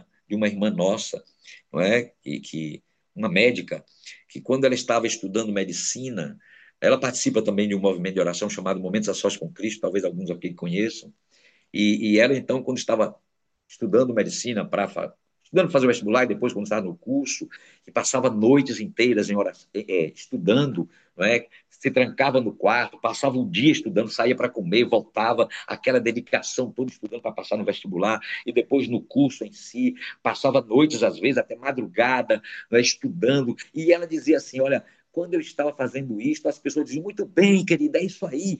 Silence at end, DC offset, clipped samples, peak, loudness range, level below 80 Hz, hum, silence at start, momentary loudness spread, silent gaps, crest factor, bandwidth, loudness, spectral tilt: 0 s; under 0.1%; under 0.1%; -4 dBFS; 4 LU; -72 dBFS; none; 0.3 s; 11 LU; none; 20 dB; 9.2 kHz; -23 LUFS; -4.5 dB/octave